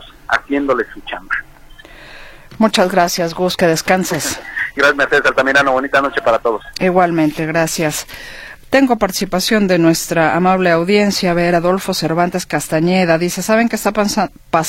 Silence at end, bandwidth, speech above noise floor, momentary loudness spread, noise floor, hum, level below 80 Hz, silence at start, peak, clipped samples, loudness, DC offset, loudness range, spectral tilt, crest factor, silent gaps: 0 s; 16.5 kHz; 24 dB; 8 LU; -39 dBFS; none; -42 dBFS; 0 s; 0 dBFS; under 0.1%; -15 LUFS; under 0.1%; 3 LU; -4.5 dB/octave; 16 dB; none